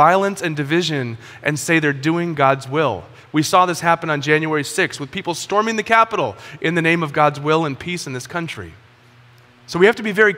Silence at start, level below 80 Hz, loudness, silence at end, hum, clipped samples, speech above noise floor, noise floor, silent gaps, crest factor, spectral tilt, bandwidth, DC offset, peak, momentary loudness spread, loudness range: 0 s; -58 dBFS; -18 LUFS; 0 s; none; under 0.1%; 30 dB; -48 dBFS; none; 18 dB; -5 dB/octave; 16.5 kHz; under 0.1%; 0 dBFS; 11 LU; 3 LU